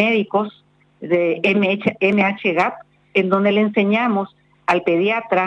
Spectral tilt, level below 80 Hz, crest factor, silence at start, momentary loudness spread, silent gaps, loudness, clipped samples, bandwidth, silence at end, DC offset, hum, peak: -7 dB/octave; -64 dBFS; 14 dB; 0 s; 6 LU; none; -18 LUFS; under 0.1%; 8 kHz; 0 s; under 0.1%; none; -4 dBFS